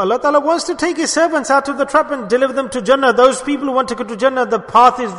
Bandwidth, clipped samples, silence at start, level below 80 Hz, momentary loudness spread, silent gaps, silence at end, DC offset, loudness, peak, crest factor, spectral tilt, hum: 11 kHz; under 0.1%; 0 s; -52 dBFS; 7 LU; none; 0 s; under 0.1%; -15 LUFS; 0 dBFS; 14 dB; -3 dB/octave; none